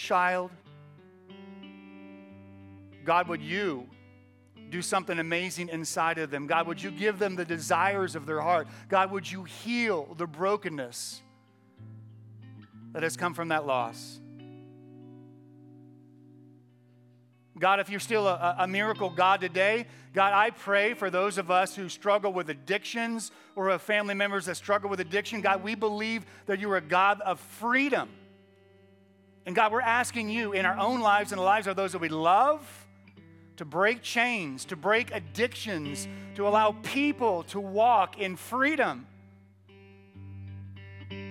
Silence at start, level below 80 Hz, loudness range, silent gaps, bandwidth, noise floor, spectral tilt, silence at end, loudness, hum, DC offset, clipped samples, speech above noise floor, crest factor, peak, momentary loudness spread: 0 s; -86 dBFS; 8 LU; none; 17 kHz; -61 dBFS; -4 dB/octave; 0 s; -28 LUFS; none; under 0.1%; under 0.1%; 32 dB; 20 dB; -8 dBFS; 17 LU